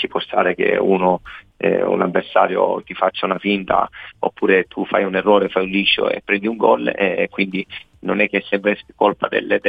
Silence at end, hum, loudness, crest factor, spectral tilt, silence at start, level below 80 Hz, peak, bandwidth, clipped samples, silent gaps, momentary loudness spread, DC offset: 0 s; none; -18 LUFS; 18 dB; -7.5 dB/octave; 0 s; -54 dBFS; 0 dBFS; 5 kHz; under 0.1%; none; 7 LU; under 0.1%